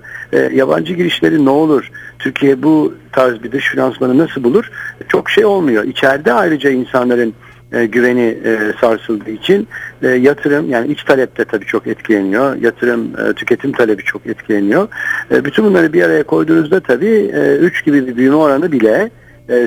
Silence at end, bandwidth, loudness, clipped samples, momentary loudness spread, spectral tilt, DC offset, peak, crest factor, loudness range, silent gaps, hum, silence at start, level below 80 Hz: 0 s; 18.5 kHz; -13 LUFS; 0.1%; 7 LU; -6.5 dB/octave; under 0.1%; 0 dBFS; 12 dB; 3 LU; none; none; 0.05 s; -52 dBFS